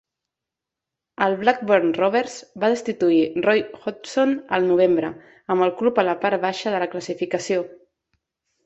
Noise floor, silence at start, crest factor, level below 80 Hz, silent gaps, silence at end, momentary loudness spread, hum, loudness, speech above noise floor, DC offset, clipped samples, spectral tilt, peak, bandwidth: -86 dBFS; 1.2 s; 20 dB; -66 dBFS; none; 0.9 s; 9 LU; none; -21 LUFS; 65 dB; under 0.1%; under 0.1%; -5 dB/octave; -2 dBFS; 8.2 kHz